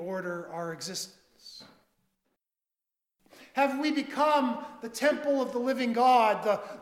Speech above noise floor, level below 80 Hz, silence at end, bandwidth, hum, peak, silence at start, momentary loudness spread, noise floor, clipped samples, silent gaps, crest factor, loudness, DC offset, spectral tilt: over 62 dB; -78 dBFS; 0 s; 16 kHz; none; -12 dBFS; 0 s; 15 LU; under -90 dBFS; under 0.1%; none; 18 dB; -28 LUFS; under 0.1%; -4 dB/octave